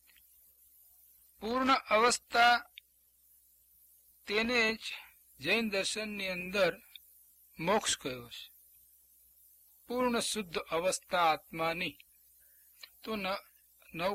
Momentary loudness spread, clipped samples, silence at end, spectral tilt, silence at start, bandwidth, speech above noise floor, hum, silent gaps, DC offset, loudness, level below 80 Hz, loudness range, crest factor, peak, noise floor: 21 LU; under 0.1%; 0 s; -2.5 dB/octave; 1.4 s; 16 kHz; 36 dB; 60 Hz at -65 dBFS; none; under 0.1%; -32 LUFS; -66 dBFS; 5 LU; 22 dB; -12 dBFS; -68 dBFS